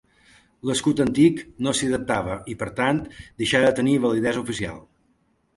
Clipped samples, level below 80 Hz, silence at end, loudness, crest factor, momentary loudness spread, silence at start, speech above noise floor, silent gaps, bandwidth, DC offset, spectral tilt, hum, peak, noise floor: under 0.1%; -50 dBFS; 0.75 s; -23 LUFS; 18 dB; 12 LU; 0.65 s; 44 dB; none; 11.5 kHz; under 0.1%; -5 dB/octave; none; -4 dBFS; -66 dBFS